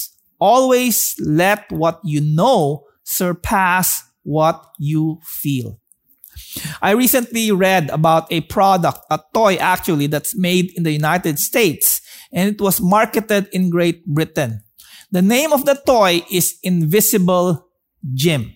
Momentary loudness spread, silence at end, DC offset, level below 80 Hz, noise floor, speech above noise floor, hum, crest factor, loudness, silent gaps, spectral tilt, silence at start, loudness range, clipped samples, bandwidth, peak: 9 LU; 0.05 s; under 0.1%; -48 dBFS; -48 dBFS; 32 dB; none; 14 dB; -16 LUFS; none; -4.5 dB/octave; 0 s; 3 LU; under 0.1%; 16.5 kHz; -2 dBFS